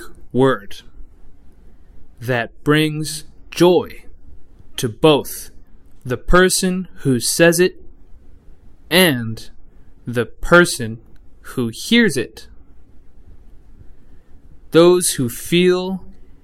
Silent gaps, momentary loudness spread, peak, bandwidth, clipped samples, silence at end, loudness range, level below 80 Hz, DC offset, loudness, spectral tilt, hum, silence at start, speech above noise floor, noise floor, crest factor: none; 18 LU; 0 dBFS; 16 kHz; under 0.1%; 0.1 s; 5 LU; -36 dBFS; under 0.1%; -16 LUFS; -4.5 dB/octave; none; 0 s; 23 dB; -39 dBFS; 18 dB